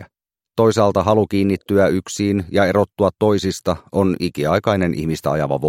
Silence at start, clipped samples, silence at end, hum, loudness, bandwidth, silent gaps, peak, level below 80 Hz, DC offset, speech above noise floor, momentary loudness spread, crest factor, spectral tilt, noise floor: 0 s; under 0.1%; 0 s; none; -18 LUFS; 16.5 kHz; none; 0 dBFS; -46 dBFS; under 0.1%; 57 dB; 5 LU; 16 dB; -6.5 dB/octave; -74 dBFS